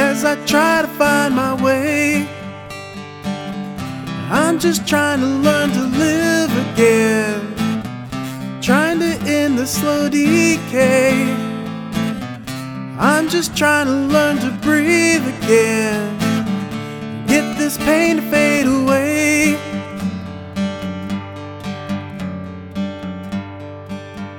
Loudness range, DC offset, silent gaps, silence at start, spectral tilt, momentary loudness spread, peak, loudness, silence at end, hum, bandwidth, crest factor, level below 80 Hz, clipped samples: 5 LU; under 0.1%; none; 0 s; -4.5 dB/octave; 14 LU; 0 dBFS; -17 LUFS; 0 s; none; 17.5 kHz; 18 dB; -48 dBFS; under 0.1%